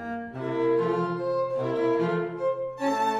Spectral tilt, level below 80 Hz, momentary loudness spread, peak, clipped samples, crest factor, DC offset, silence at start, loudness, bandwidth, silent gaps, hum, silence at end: -7 dB/octave; -64 dBFS; 5 LU; -14 dBFS; under 0.1%; 12 dB; under 0.1%; 0 s; -27 LUFS; 13 kHz; none; none; 0 s